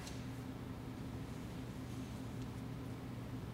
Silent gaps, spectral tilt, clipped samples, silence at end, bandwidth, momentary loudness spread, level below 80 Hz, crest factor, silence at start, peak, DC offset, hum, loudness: none; -6.5 dB/octave; under 0.1%; 0 s; 16 kHz; 1 LU; -58 dBFS; 12 dB; 0 s; -34 dBFS; under 0.1%; none; -47 LUFS